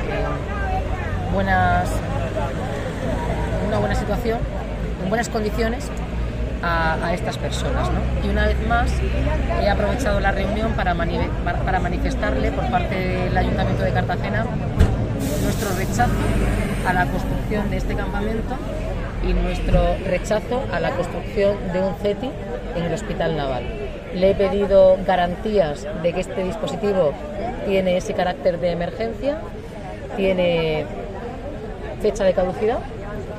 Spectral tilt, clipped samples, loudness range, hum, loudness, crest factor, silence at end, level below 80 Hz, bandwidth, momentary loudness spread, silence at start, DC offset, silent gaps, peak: -6.5 dB/octave; under 0.1%; 4 LU; none; -22 LUFS; 18 dB; 0 s; -28 dBFS; 15.5 kHz; 8 LU; 0 s; under 0.1%; none; -2 dBFS